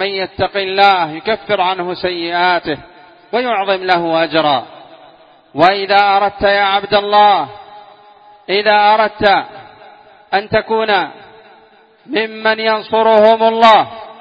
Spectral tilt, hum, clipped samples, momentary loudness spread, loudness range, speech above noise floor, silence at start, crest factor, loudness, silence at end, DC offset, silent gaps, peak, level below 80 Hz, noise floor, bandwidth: -5.5 dB/octave; none; under 0.1%; 10 LU; 4 LU; 34 dB; 0 s; 14 dB; -13 LUFS; 0.1 s; under 0.1%; none; 0 dBFS; -50 dBFS; -47 dBFS; 8 kHz